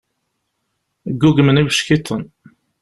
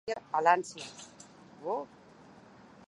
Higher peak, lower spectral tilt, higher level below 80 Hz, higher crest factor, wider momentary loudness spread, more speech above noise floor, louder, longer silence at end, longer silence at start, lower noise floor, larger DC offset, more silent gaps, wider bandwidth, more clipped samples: first, -2 dBFS vs -10 dBFS; first, -5.5 dB/octave vs -3.5 dB/octave; first, -46 dBFS vs -76 dBFS; second, 16 dB vs 24 dB; second, 17 LU vs 24 LU; first, 57 dB vs 24 dB; first, -15 LUFS vs -31 LUFS; second, 0.55 s vs 1.05 s; first, 1.05 s vs 0.05 s; first, -72 dBFS vs -56 dBFS; neither; neither; about the same, 12.5 kHz vs 11.5 kHz; neither